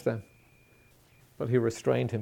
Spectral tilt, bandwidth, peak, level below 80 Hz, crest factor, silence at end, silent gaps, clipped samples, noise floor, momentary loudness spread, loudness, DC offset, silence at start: -7 dB/octave; 16.5 kHz; -12 dBFS; -66 dBFS; 20 dB; 0 s; none; under 0.1%; -61 dBFS; 11 LU; -30 LUFS; under 0.1%; 0 s